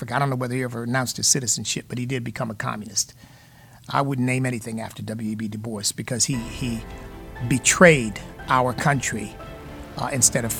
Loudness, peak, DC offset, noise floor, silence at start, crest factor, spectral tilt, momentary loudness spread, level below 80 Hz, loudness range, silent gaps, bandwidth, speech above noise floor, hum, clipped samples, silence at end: -22 LUFS; -2 dBFS; under 0.1%; -49 dBFS; 0 s; 22 dB; -3.5 dB/octave; 15 LU; -46 dBFS; 6 LU; none; 19 kHz; 25 dB; none; under 0.1%; 0 s